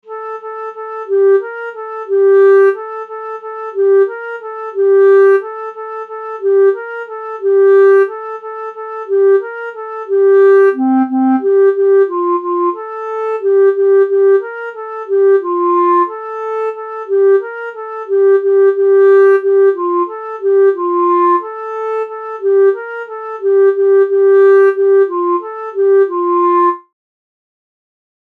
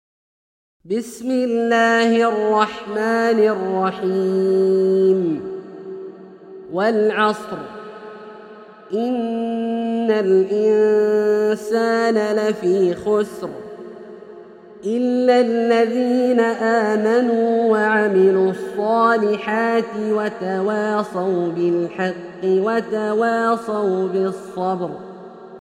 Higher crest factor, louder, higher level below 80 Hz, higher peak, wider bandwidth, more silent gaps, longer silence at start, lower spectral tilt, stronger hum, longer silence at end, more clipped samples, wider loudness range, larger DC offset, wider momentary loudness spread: second, 10 dB vs 16 dB; first, -12 LUFS vs -18 LUFS; second, -88 dBFS vs -64 dBFS; about the same, -2 dBFS vs -2 dBFS; second, 3.7 kHz vs 12 kHz; neither; second, 0.05 s vs 0.85 s; about the same, -6 dB/octave vs -6 dB/octave; neither; first, 1.5 s vs 0.05 s; neither; about the same, 3 LU vs 5 LU; neither; about the same, 16 LU vs 17 LU